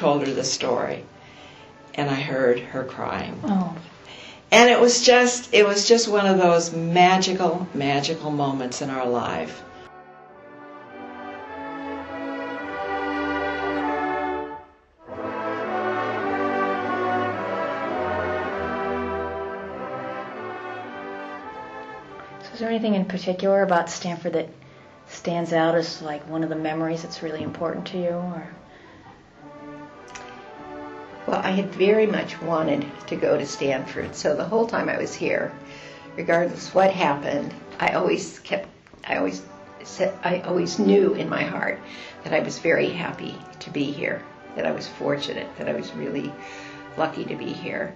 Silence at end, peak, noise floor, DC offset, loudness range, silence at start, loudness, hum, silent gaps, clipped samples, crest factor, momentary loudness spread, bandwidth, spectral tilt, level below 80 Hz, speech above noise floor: 0 s; -4 dBFS; -49 dBFS; under 0.1%; 13 LU; 0 s; -23 LUFS; none; none; under 0.1%; 22 dB; 21 LU; 8.6 kHz; -4 dB/octave; -58 dBFS; 26 dB